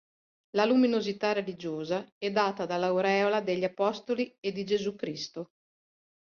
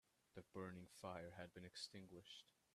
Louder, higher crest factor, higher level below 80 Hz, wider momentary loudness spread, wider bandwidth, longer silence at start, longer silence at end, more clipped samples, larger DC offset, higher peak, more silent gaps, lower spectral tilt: first, -29 LUFS vs -57 LUFS; about the same, 18 dB vs 20 dB; first, -74 dBFS vs -84 dBFS; first, 11 LU vs 8 LU; second, 7 kHz vs 13.5 kHz; first, 0.55 s vs 0.35 s; first, 0.85 s vs 0.25 s; neither; neither; first, -12 dBFS vs -38 dBFS; first, 2.12-2.21 s vs none; about the same, -5.5 dB/octave vs -4.5 dB/octave